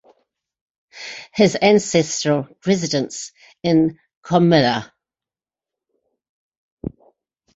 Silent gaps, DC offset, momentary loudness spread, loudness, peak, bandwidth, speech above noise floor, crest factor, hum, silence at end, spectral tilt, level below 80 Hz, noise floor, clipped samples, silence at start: 4.17-4.22 s, 6.29-6.77 s; under 0.1%; 19 LU; -18 LUFS; -2 dBFS; 8 kHz; over 73 dB; 20 dB; none; 0.7 s; -5 dB/octave; -56 dBFS; under -90 dBFS; under 0.1%; 0.95 s